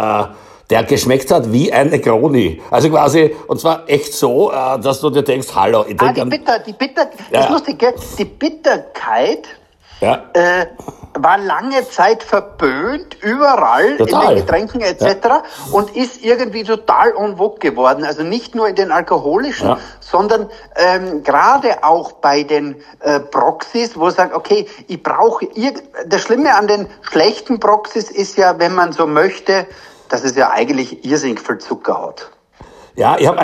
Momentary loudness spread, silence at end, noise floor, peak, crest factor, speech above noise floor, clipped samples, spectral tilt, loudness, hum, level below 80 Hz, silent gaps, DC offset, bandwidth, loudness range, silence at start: 8 LU; 0 s; -41 dBFS; 0 dBFS; 14 dB; 27 dB; under 0.1%; -5 dB/octave; -14 LUFS; none; -48 dBFS; none; under 0.1%; 15.5 kHz; 3 LU; 0 s